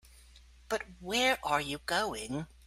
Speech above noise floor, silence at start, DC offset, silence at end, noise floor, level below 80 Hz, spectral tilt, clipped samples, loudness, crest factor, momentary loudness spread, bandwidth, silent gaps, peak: 24 dB; 0.15 s; under 0.1%; 0.2 s; -57 dBFS; -56 dBFS; -3 dB/octave; under 0.1%; -32 LUFS; 20 dB; 10 LU; 16 kHz; none; -14 dBFS